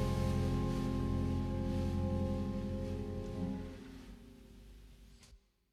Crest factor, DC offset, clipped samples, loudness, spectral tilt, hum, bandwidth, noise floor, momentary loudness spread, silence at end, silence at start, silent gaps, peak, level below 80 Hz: 14 dB; under 0.1%; under 0.1%; -38 LUFS; -8 dB/octave; none; 14 kHz; -63 dBFS; 22 LU; 0.35 s; 0 s; none; -22 dBFS; -46 dBFS